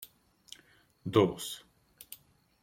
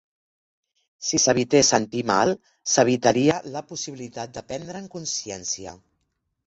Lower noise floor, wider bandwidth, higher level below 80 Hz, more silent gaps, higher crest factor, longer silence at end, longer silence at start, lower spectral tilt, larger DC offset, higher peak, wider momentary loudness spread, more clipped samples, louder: second, -64 dBFS vs -75 dBFS; first, 16.5 kHz vs 8.2 kHz; second, -70 dBFS vs -58 dBFS; neither; about the same, 24 dB vs 22 dB; second, 0.5 s vs 0.7 s; second, 0 s vs 1 s; first, -5.5 dB/octave vs -3 dB/octave; neither; second, -10 dBFS vs -2 dBFS; first, 25 LU vs 16 LU; neither; second, -31 LUFS vs -22 LUFS